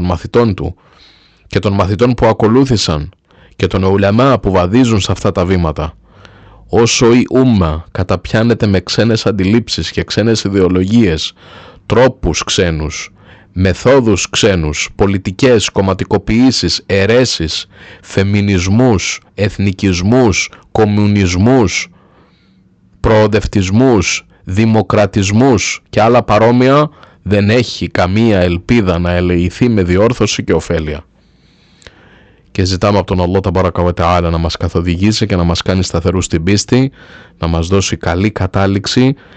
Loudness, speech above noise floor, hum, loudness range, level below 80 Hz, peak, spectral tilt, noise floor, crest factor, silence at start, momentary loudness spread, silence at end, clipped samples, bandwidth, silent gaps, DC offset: -12 LUFS; 37 dB; none; 3 LU; -32 dBFS; 0 dBFS; -5.5 dB/octave; -49 dBFS; 12 dB; 0 s; 8 LU; 0.25 s; under 0.1%; 9 kHz; none; under 0.1%